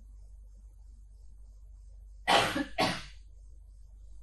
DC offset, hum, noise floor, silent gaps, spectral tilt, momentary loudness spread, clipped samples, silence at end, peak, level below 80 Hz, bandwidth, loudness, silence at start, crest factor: under 0.1%; none; -52 dBFS; none; -3 dB/octave; 28 LU; under 0.1%; 0 s; -10 dBFS; -50 dBFS; 12 kHz; -29 LUFS; 0 s; 26 dB